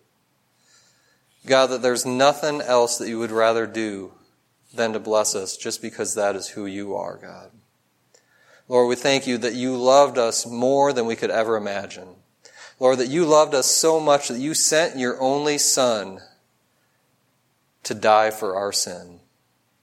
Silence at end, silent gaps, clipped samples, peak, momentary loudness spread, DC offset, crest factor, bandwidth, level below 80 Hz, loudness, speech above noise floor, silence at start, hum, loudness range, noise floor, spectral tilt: 0.65 s; none; under 0.1%; -2 dBFS; 13 LU; under 0.1%; 20 dB; 16.5 kHz; -74 dBFS; -20 LUFS; 46 dB; 1.45 s; none; 7 LU; -67 dBFS; -2.5 dB/octave